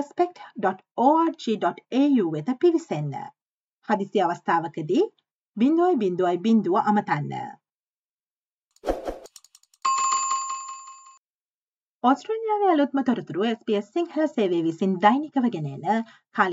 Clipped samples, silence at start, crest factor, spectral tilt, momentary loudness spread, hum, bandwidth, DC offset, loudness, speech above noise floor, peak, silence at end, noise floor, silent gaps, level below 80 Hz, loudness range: under 0.1%; 0 s; 20 dB; -5 dB/octave; 12 LU; none; 8.4 kHz; under 0.1%; -24 LUFS; over 67 dB; -4 dBFS; 0 s; under -90 dBFS; 0.91-0.95 s, 3.42-3.82 s, 5.31-5.53 s, 7.72-8.19 s, 8.26-8.71 s, 11.17-12.01 s; -54 dBFS; 6 LU